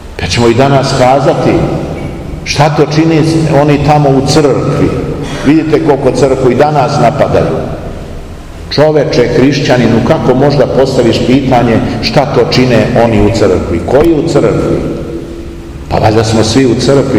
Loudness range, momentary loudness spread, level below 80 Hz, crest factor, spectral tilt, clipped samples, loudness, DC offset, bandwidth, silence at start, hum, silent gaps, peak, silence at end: 2 LU; 12 LU; -26 dBFS; 8 dB; -6.5 dB/octave; 4%; -8 LUFS; 0.6%; 14 kHz; 0 s; none; none; 0 dBFS; 0 s